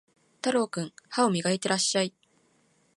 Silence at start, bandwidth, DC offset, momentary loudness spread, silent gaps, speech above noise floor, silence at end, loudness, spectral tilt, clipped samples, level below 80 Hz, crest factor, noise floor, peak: 0.45 s; 11.5 kHz; under 0.1%; 8 LU; none; 40 dB; 0.9 s; -27 LUFS; -3.5 dB/octave; under 0.1%; -76 dBFS; 20 dB; -67 dBFS; -10 dBFS